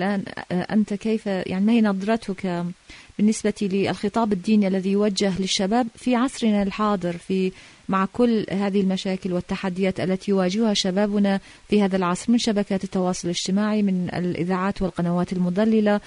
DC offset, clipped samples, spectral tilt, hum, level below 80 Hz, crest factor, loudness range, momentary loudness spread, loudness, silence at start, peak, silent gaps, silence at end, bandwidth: under 0.1%; under 0.1%; -5.5 dB/octave; none; -50 dBFS; 14 dB; 2 LU; 6 LU; -23 LUFS; 0 s; -8 dBFS; none; 0 s; 11 kHz